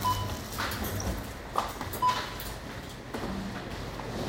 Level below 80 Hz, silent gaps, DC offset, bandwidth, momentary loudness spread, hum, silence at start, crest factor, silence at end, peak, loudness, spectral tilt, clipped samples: -44 dBFS; none; under 0.1%; 17 kHz; 10 LU; none; 0 s; 22 dB; 0 s; -10 dBFS; -34 LUFS; -4 dB/octave; under 0.1%